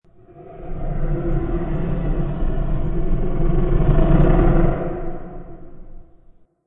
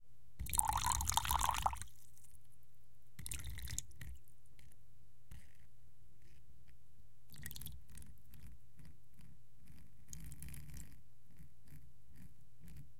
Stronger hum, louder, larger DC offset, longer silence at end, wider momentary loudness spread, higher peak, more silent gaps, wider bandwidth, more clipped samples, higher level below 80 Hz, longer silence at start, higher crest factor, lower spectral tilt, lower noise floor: neither; first, -22 LUFS vs -40 LUFS; second, under 0.1% vs 0.6%; first, 0.65 s vs 0 s; second, 21 LU vs 28 LU; first, -2 dBFS vs -10 dBFS; neither; second, 3.5 kHz vs 17 kHz; neither; first, -20 dBFS vs -54 dBFS; first, 0.35 s vs 0 s; second, 16 dB vs 36 dB; first, -12 dB/octave vs -1.5 dB/octave; second, -49 dBFS vs -70 dBFS